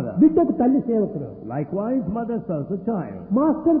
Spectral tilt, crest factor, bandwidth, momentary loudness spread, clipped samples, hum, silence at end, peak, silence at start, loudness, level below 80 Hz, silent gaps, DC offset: -14 dB/octave; 14 dB; 2.9 kHz; 11 LU; under 0.1%; none; 0 s; -6 dBFS; 0 s; -22 LUFS; -52 dBFS; none; under 0.1%